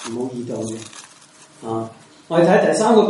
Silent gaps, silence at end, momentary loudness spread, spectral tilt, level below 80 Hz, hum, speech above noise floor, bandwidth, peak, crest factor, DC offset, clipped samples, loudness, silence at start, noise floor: none; 0 s; 21 LU; -5.5 dB/octave; -66 dBFS; none; 29 dB; 11.5 kHz; -2 dBFS; 18 dB; under 0.1%; under 0.1%; -19 LUFS; 0 s; -47 dBFS